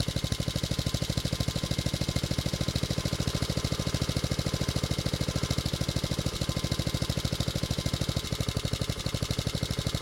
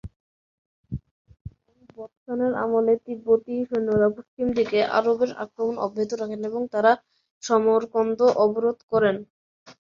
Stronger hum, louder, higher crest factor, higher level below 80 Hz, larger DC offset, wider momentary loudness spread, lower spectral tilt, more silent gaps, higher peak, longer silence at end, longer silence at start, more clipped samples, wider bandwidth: neither; second, -30 LUFS vs -23 LUFS; about the same, 20 dB vs 20 dB; first, -40 dBFS vs -54 dBFS; neither; second, 1 LU vs 14 LU; second, -4.5 dB/octave vs -6 dB/octave; second, none vs 0.16-0.84 s, 1.11-1.25 s, 1.41-1.45 s, 2.17-2.26 s, 4.28-4.37 s, 7.31-7.41 s, 8.83-8.88 s, 9.30-9.66 s; second, -10 dBFS vs -4 dBFS; second, 0 s vs 0.15 s; about the same, 0 s vs 0.05 s; neither; first, 17 kHz vs 7.4 kHz